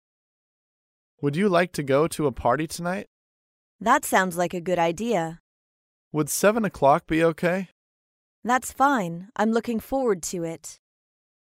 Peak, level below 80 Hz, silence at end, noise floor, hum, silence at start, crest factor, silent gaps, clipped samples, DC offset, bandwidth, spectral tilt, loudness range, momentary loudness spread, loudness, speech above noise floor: -6 dBFS; -54 dBFS; 0.7 s; under -90 dBFS; none; 1.2 s; 20 dB; 3.07-3.79 s, 5.40-6.11 s, 7.72-8.43 s; under 0.1%; under 0.1%; 16 kHz; -5 dB/octave; 2 LU; 11 LU; -24 LUFS; over 67 dB